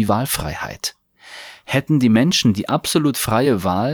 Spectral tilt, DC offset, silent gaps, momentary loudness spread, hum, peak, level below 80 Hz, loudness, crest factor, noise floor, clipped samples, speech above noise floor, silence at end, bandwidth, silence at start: -5 dB/octave; under 0.1%; none; 18 LU; none; -4 dBFS; -44 dBFS; -18 LUFS; 14 dB; -40 dBFS; under 0.1%; 22 dB; 0 s; over 20 kHz; 0 s